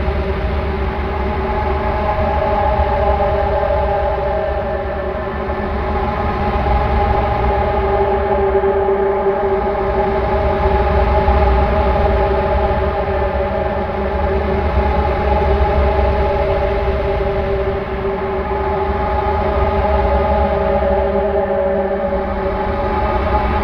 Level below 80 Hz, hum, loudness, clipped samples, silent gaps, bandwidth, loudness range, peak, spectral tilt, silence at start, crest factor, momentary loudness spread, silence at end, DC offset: -22 dBFS; none; -17 LUFS; under 0.1%; none; 5.6 kHz; 3 LU; 0 dBFS; -9 dB/octave; 0 s; 16 dB; 5 LU; 0 s; under 0.1%